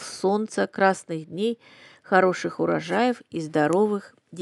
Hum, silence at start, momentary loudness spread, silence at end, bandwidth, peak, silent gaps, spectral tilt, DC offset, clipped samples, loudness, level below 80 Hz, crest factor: none; 0 s; 11 LU; 0 s; 12 kHz; -4 dBFS; none; -5.5 dB/octave; under 0.1%; under 0.1%; -24 LUFS; -74 dBFS; 20 dB